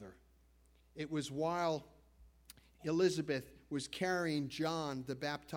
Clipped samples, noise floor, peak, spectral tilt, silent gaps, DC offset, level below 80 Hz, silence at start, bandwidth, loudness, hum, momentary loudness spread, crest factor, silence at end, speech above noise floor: under 0.1%; -68 dBFS; -20 dBFS; -5 dB/octave; none; under 0.1%; -68 dBFS; 0 s; 17 kHz; -38 LUFS; none; 11 LU; 20 dB; 0 s; 30 dB